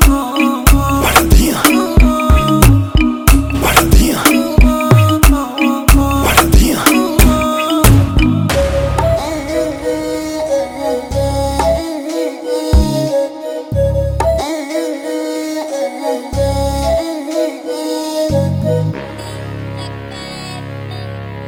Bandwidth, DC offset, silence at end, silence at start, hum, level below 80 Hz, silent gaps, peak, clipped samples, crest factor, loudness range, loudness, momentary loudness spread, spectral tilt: over 20 kHz; under 0.1%; 0 s; 0 s; none; -18 dBFS; none; 0 dBFS; under 0.1%; 12 dB; 7 LU; -13 LUFS; 14 LU; -5 dB/octave